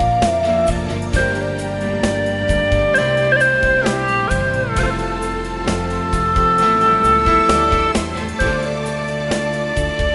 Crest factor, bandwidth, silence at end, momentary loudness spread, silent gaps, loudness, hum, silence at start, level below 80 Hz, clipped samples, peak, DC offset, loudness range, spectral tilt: 16 dB; 11.5 kHz; 0 s; 9 LU; none; -17 LUFS; none; 0 s; -26 dBFS; under 0.1%; -2 dBFS; under 0.1%; 2 LU; -5.5 dB/octave